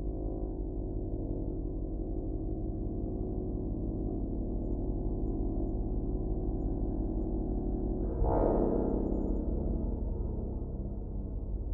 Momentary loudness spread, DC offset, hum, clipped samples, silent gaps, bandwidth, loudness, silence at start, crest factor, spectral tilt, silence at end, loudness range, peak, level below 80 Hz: 7 LU; under 0.1%; none; under 0.1%; none; 1.9 kHz; -35 LUFS; 0 s; 18 dB; -14 dB/octave; 0 s; 4 LU; -14 dBFS; -36 dBFS